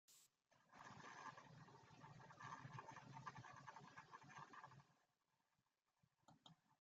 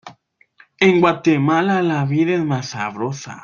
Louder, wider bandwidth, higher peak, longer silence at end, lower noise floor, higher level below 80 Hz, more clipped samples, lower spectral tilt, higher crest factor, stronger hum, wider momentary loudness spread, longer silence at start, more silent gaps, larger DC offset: second, -61 LUFS vs -18 LUFS; about the same, 7.6 kHz vs 7.4 kHz; second, -42 dBFS vs -2 dBFS; about the same, 0.05 s vs 0.05 s; first, under -90 dBFS vs -53 dBFS; second, under -90 dBFS vs -60 dBFS; neither; second, -3.5 dB/octave vs -6.5 dB/octave; first, 22 dB vs 16 dB; neither; second, 7 LU vs 11 LU; about the same, 0.1 s vs 0.05 s; neither; neither